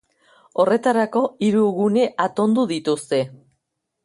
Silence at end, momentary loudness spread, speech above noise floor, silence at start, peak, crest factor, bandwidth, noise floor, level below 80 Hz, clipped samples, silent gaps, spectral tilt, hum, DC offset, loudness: 0.7 s; 5 LU; 57 dB; 0.55 s; -6 dBFS; 16 dB; 11.5 kHz; -76 dBFS; -66 dBFS; under 0.1%; none; -6 dB/octave; none; under 0.1%; -20 LUFS